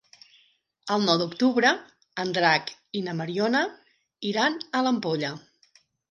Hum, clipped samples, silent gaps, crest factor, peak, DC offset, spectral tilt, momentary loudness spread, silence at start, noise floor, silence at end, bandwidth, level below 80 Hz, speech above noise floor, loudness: none; under 0.1%; none; 20 dB; -6 dBFS; under 0.1%; -4.5 dB/octave; 12 LU; 0.85 s; -65 dBFS; 0.75 s; 10.5 kHz; -76 dBFS; 40 dB; -25 LUFS